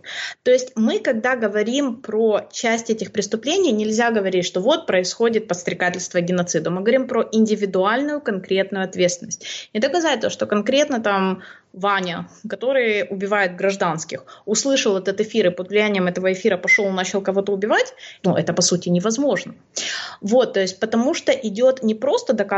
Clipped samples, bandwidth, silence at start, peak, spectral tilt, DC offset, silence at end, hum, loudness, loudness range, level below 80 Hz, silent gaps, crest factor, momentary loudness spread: under 0.1%; 8.2 kHz; 0.05 s; -4 dBFS; -4 dB/octave; under 0.1%; 0 s; none; -20 LUFS; 2 LU; -68 dBFS; none; 16 dB; 7 LU